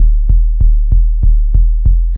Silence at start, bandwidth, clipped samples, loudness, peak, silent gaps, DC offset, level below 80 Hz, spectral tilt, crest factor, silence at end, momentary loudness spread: 0 s; 0.6 kHz; 0.1%; -14 LUFS; 0 dBFS; none; under 0.1%; -8 dBFS; -13 dB/octave; 8 dB; 0 s; 1 LU